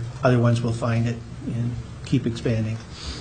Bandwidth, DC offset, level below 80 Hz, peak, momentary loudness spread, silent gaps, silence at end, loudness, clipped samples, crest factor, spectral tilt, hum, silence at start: 9.4 kHz; 0.1%; -42 dBFS; -4 dBFS; 12 LU; none; 0 s; -24 LUFS; under 0.1%; 18 dB; -7 dB/octave; none; 0 s